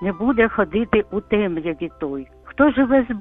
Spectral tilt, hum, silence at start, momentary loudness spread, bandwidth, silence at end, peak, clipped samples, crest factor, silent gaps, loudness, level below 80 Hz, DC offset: -9.5 dB/octave; none; 0 s; 12 LU; 3.9 kHz; 0 s; -2 dBFS; under 0.1%; 18 dB; none; -20 LUFS; -42 dBFS; under 0.1%